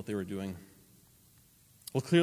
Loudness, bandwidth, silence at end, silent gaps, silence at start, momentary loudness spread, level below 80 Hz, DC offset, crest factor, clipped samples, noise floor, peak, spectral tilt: -36 LUFS; 16 kHz; 0 s; none; 0 s; 17 LU; -64 dBFS; under 0.1%; 20 dB; under 0.1%; -63 dBFS; -14 dBFS; -6 dB/octave